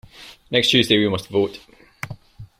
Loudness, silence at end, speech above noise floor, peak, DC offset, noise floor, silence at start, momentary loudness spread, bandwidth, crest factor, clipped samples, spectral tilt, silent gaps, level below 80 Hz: -18 LUFS; 0.15 s; 20 dB; -2 dBFS; under 0.1%; -39 dBFS; 0.2 s; 19 LU; 16 kHz; 20 dB; under 0.1%; -4.5 dB/octave; none; -54 dBFS